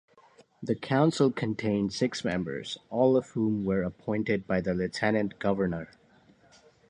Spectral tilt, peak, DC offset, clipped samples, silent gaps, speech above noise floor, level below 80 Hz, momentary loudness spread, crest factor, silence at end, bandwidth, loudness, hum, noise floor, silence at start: -6.5 dB/octave; -10 dBFS; under 0.1%; under 0.1%; none; 32 dB; -58 dBFS; 9 LU; 18 dB; 1.05 s; 10.5 kHz; -29 LUFS; none; -60 dBFS; 0.6 s